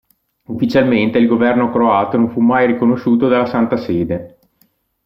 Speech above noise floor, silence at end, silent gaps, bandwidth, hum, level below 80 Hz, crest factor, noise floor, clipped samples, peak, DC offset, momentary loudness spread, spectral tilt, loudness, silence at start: 45 dB; 0.8 s; none; 6 kHz; none; -52 dBFS; 12 dB; -59 dBFS; under 0.1%; -2 dBFS; under 0.1%; 6 LU; -8.5 dB/octave; -14 LUFS; 0.5 s